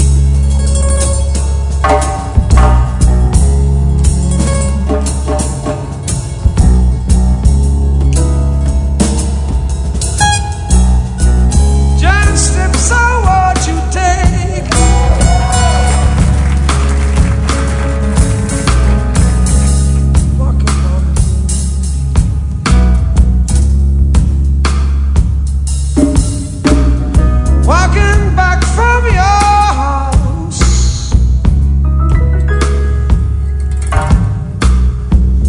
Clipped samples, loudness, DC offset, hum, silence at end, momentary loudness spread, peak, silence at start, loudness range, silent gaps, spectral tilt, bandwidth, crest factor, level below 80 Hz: 0.8%; -12 LUFS; under 0.1%; none; 0 s; 5 LU; 0 dBFS; 0 s; 2 LU; none; -5.5 dB/octave; 11 kHz; 10 dB; -12 dBFS